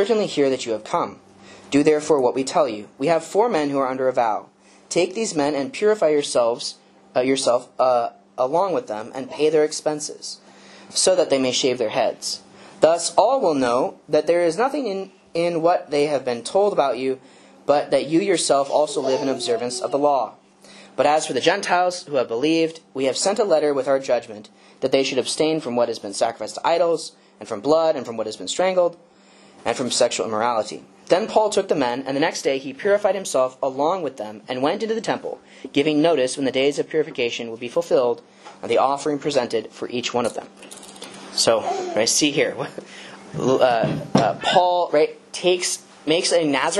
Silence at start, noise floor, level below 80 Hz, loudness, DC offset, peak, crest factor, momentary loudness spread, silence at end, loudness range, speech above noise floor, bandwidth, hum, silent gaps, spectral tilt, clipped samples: 0 s; -50 dBFS; -66 dBFS; -21 LUFS; under 0.1%; 0 dBFS; 22 dB; 11 LU; 0 s; 3 LU; 30 dB; 12.5 kHz; none; none; -3.5 dB/octave; under 0.1%